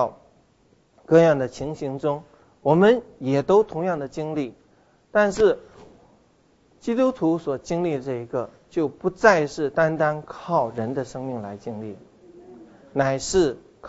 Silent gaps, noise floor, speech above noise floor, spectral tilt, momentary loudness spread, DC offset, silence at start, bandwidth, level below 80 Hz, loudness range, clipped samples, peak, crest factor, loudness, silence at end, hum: none; -60 dBFS; 38 dB; -6 dB/octave; 14 LU; under 0.1%; 0 s; 8 kHz; -54 dBFS; 6 LU; under 0.1%; -2 dBFS; 22 dB; -23 LUFS; 0 s; none